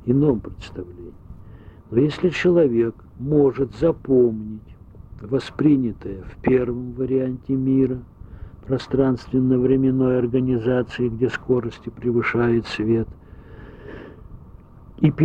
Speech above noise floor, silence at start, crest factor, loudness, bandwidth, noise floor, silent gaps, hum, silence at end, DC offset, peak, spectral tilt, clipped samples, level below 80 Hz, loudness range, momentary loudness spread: 24 dB; 0.05 s; 18 dB; -21 LUFS; 8.2 kHz; -44 dBFS; none; none; 0 s; under 0.1%; -4 dBFS; -8.5 dB/octave; under 0.1%; -44 dBFS; 4 LU; 20 LU